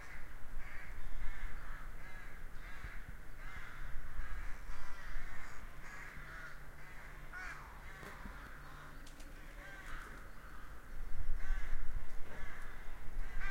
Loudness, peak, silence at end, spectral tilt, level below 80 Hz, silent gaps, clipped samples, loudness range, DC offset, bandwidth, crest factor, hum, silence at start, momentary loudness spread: -51 LUFS; -20 dBFS; 0 s; -4.5 dB/octave; -42 dBFS; none; under 0.1%; 3 LU; under 0.1%; 7.4 kHz; 14 dB; none; 0 s; 7 LU